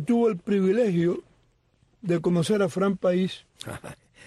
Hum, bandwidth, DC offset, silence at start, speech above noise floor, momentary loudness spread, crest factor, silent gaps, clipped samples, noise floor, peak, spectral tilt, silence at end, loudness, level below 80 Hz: none; 12.5 kHz; under 0.1%; 0 s; 41 dB; 16 LU; 12 dB; none; under 0.1%; -65 dBFS; -14 dBFS; -7 dB/octave; 0.3 s; -24 LUFS; -62 dBFS